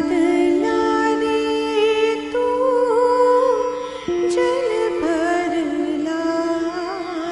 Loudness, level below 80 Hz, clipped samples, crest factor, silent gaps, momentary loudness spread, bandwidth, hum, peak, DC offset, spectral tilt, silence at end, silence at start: -19 LUFS; -52 dBFS; under 0.1%; 12 dB; none; 7 LU; 11.5 kHz; 60 Hz at -55 dBFS; -6 dBFS; under 0.1%; -4 dB/octave; 0 s; 0 s